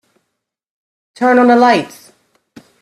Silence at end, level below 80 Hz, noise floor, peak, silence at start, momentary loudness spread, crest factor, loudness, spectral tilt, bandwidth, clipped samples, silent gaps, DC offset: 0.95 s; -64 dBFS; -74 dBFS; 0 dBFS; 1.2 s; 10 LU; 16 dB; -11 LUFS; -5 dB/octave; 13.5 kHz; under 0.1%; none; under 0.1%